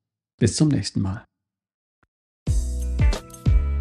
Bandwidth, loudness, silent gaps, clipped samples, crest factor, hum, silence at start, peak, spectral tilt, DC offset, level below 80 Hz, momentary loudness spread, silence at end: 12.5 kHz; -24 LUFS; 1.74-2.02 s, 2.08-2.46 s; under 0.1%; 18 dB; none; 0.4 s; -4 dBFS; -6 dB/octave; under 0.1%; -26 dBFS; 9 LU; 0 s